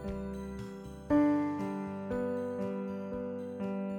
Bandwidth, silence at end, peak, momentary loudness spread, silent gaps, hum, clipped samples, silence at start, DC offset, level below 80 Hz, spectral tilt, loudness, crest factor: 9.2 kHz; 0 s; -16 dBFS; 13 LU; none; none; under 0.1%; 0 s; under 0.1%; -54 dBFS; -8.5 dB/octave; -35 LUFS; 18 dB